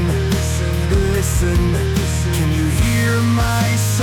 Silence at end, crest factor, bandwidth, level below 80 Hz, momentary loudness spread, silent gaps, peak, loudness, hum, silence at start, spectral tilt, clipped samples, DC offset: 0 s; 8 dB; 18.5 kHz; -24 dBFS; 3 LU; none; -6 dBFS; -17 LUFS; none; 0 s; -5.5 dB/octave; under 0.1%; under 0.1%